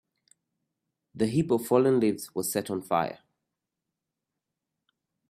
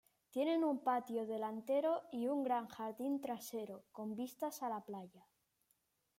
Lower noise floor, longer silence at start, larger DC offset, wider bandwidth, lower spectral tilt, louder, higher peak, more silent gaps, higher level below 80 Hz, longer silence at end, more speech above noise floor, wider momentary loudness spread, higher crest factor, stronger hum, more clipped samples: first, -86 dBFS vs -81 dBFS; first, 1.15 s vs 0.35 s; neither; about the same, 16 kHz vs 16.5 kHz; about the same, -6 dB/octave vs -5 dB/octave; first, -27 LUFS vs -40 LUFS; first, -8 dBFS vs -24 dBFS; neither; first, -66 dBFS vs -88 dBFS; first, 2.15 s vs 1 s; first, 60 dB vs 41 dB; second, 8 LU vs 11 LU; first, 22 dB vs 16 dB; neither; neither